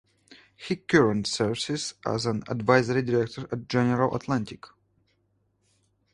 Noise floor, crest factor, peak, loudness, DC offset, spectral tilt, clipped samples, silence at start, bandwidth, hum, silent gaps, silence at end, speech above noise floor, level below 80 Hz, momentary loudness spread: -71 dBFS; 24 dB; -4 dBFS; -26 LUFS; under 0.1%; -5.5 dB/octave; under 0.1%; 0.3 s; 11.5 kHz; none; none; 1.45 s; 45 dB; -58 dBFS; 11 LU